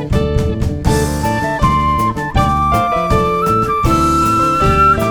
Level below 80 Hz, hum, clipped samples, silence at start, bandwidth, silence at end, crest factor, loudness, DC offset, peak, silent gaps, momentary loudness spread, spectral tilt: -22 dBFS; none; under 0.1%; 0 s; over 20 kHz; 0 s; 14 dB; -14 LUFS; under 0.1%; 0 dBFS; none; 5 LU; -6 dB/octave